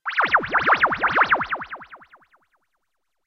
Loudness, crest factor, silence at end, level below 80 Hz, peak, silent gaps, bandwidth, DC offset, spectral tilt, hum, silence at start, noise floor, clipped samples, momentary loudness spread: -19 LUFS; 18 dB; 1.3 s; -56 dBFS; -6 dBFS; none; 6.6 kHz; under 0.1%; -4.5 dB/octave; none; 0.05 s; -78 dBFS; under 0.1%; 14 LU